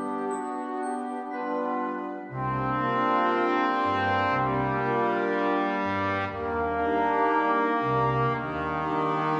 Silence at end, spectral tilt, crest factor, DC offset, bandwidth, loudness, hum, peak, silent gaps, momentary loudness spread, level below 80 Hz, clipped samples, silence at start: 0 s; -7 dB/octave; 16 dB; under 0.1%; 9 kHz; -27 LUFS; none; -12 dBFS; none; 8 LU; -54 dBFS; under 0.1%; 0 s